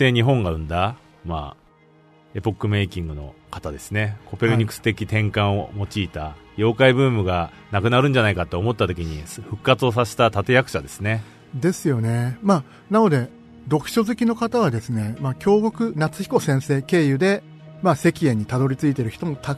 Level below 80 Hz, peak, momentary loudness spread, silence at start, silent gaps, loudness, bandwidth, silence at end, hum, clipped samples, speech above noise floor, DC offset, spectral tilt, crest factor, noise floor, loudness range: -44 dBFS; -2 dBFS; 13 LU; 0 s; none; -21 LUFS; 13.5 kHz; 0 s; none; under 0.1%; 33 dB; under 0.1%; -6.5 dB/octave; 20 dB; -53 dBFS; 5 LU